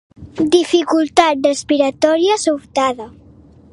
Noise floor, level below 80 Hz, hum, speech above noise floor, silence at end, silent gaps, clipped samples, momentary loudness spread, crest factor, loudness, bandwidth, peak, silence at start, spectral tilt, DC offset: -44 dBFS; -50 dBFS; none; 29 dB; 0.65 s; none; under 0.1%; 8 LU; 16 dB; -15 LUFS; 11.5 kHz; 0 dBFS; 0.2 s; -3.5 dB/octave; under 0.1%